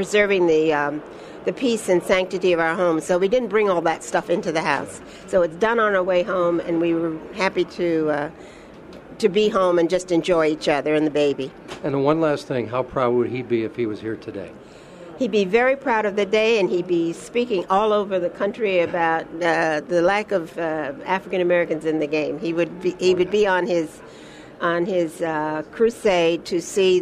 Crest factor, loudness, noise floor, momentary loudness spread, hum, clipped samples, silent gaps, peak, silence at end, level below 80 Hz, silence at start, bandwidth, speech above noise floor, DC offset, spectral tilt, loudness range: 18 dB; -21 LUFS; -41 dBFS; 9 LU; none; under 0.1%; none; -4 dBFS; 0 s; -54 dBFS; 0 s; 13 kHz; 20 dB; under 0.1%; -5 dB/octave; 3 LU